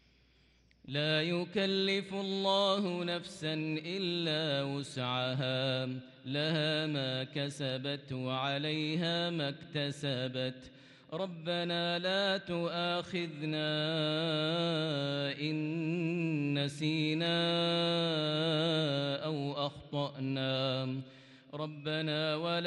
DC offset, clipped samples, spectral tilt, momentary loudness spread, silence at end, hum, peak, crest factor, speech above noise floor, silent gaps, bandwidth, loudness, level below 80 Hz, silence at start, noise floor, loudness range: under 0.1%; under 0.1%; -6 dB/octave; 7 LU; 0 s; none; -18 dBFS; 16 dB; 33 dB; none; 11.5 kHz; -34 LUFS; -74 dBFS; 0.85 s; -67 dBFS; 4 LU